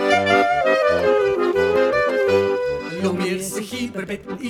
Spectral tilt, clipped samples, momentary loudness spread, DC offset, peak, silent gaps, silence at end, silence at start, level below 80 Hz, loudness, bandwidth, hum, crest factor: -4.5 dB/octave; under 0.1%; 11 LU; under 0.1%; -4 dBFS; none; 0 s; 0 s; -50 dBFS; -19 LUFS; 16 kHz; none; 16 dB